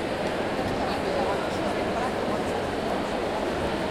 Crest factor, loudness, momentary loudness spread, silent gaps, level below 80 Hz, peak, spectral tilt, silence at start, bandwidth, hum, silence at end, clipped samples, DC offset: 14 dB; -27 LUFS; 2 LU; none; -46 dBFS; -14 dBFS; -5 dB/octave; 0 s; 16.5 kHz; none; 0 s; under 0.1%; under 0.1%